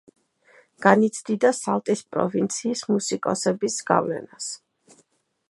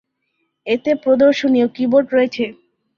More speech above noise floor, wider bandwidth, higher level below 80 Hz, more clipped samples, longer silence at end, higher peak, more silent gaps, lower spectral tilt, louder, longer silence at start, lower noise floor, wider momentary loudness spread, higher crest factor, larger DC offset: second, 43 dB vs 55 dB; first, 11.5 kHz vs 7 kHz; second, -70 dBFS vs -60 dBFS; neither; first, 0.95 s vs 0.45 s; about the same, 0 dBFS vs -2 dBFS; neither; about the same, -4.5 dB/octave vs -5.5 dB/octave; second, -23 LUFS vs -16 LUFS; first, 0.8 s vs 0.65 s; second, -65 dBFS vs -70 dBFS; about the same, 12 LU vs 11 LU; first, 24 dB vs 14 dB; neither